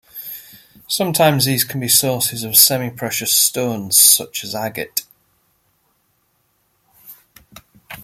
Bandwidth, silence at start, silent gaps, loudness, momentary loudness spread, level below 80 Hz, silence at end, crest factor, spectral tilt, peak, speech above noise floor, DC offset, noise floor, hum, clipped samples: 16.5 kHz; 0.15 s; none; -14 LUFS; 15 LU; -58 dBFS; 0 s; 20 dB; -2 dB/octave; 0 dBFS; 48 dB; under 0.1%; -64 dBFS; none; under 0.1%